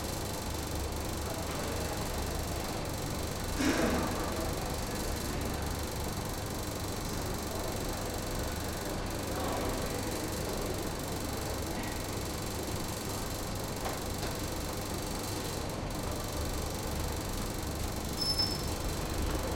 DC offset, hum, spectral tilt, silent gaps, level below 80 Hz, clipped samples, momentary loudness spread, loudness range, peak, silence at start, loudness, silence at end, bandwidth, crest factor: under 0.1%; none; -4 dB/octave; none; -42 dBFS; under 0.1%; 4 LU; 2 LU; -16 dBFS; 0 s; -35 LUFS; 0 s; 17 kHz; 18 dB